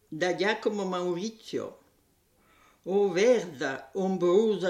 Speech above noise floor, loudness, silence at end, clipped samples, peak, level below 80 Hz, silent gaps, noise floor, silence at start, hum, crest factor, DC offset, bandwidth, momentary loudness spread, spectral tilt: 40 dB; -28 LUFS; 0 s; under 0.1%; -12 dBFS; -74 dBFS; none; -67 dBFS; 0.1 s; none; 16 dB; under 0.1%; 13 kHz; 12 LU; -5 dB/octave